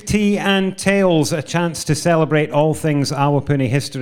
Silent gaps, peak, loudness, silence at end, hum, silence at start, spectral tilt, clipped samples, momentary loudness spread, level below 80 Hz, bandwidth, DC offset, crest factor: none; -2 dBFS; -17 LUFS; 0 s; none; 0.05 s; -5.5 dB/octave; under 0.1%; 4 LU; -44 dBFS; 16.5 kHz; under 0.1%; 14 dB